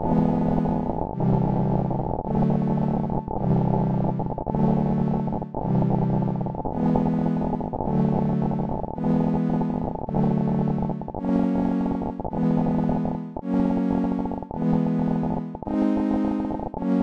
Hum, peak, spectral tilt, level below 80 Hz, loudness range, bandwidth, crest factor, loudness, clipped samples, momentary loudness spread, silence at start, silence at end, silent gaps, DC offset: none; -6 dBFS; -11 dB/octave; -40 dBFS; 1 LU; 5.4 kHz; 16 dB; -24 LUFS; under 0.1%; 6 LU; 0 s; 0 s; none; 0.7%